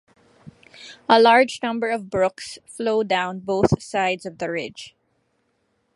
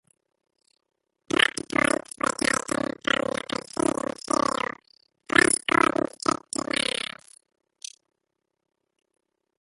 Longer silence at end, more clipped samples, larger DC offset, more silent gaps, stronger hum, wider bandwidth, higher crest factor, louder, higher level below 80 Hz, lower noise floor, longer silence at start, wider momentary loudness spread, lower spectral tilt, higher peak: second, 1.1 s vs 3.75 s; neither; neither; neither; neither; about the same, 11.5 kHz vs 12 kHz; about the same, 22 dB vs 26 dB; first, -21 LUFS vs -25 LUFS; first, -52 dBFS vs -60 dBFS; second, -69 dBFS vs -81 dBFS; second, 0.8 s vs 1.4 s; first, 20 LU vs 14 LU; first, -5 dB/octave vs -2 dB/octave; about the same, -2 dBFS vs -2 dBFS